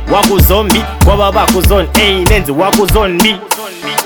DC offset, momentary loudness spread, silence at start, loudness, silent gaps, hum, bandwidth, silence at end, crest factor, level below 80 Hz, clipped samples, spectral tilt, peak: under 0.1%; 5 LU; 0 s; -10 LUFS; none; none; 19.5 kHz; 0 s; 10 dB; -16 dBFS; 0.1%; -4.5 dB/octave; 0 dBFS